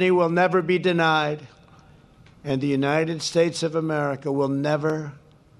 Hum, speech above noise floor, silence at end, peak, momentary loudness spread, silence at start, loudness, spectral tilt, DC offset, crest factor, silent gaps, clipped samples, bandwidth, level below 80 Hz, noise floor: none; 29 dB; 0.45 s; -6 dBFS; 9 LU; 0 s; -23 LUFS; -5.5 dB/octave; under 0.1%; 18 dB; none; under 0.1%; 12 kHz; -62 dBFS; -52 dBFS